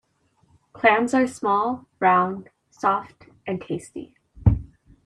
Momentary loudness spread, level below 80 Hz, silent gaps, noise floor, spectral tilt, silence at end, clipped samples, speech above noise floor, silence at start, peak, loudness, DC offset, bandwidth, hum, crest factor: 14 LU; -38 dBFS; none; -64 dBFS; -7 dB/octave; 0.4 s; under 0.1%; 42 dB; 0.75 s; -4 dBFS; -22 LUFS; under 0.1%; 11.5 kHz; none; 20 dB